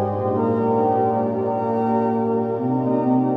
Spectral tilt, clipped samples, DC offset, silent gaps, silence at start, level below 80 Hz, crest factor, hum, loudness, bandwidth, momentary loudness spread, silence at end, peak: -11 dB/octave; under 0.1%; under 0.1%; none; 0 s; -64 dBFS; 12 dB; none; -21 LUFS; 4.9 kHz; 3 LU; 0 s; -8 dBFS